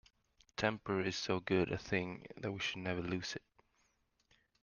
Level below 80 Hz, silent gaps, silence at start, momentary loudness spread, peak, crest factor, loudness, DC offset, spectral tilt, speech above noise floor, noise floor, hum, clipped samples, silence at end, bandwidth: -68 dBFS; none; 0.6 s; 10 LU; -16 dBFS; 24 dB; -38 LUFS; under 0.1%; -5 dB/octave; 40 dB; -78 dBFS; none; under 0.1%; 1.25 s; 7.2 kHz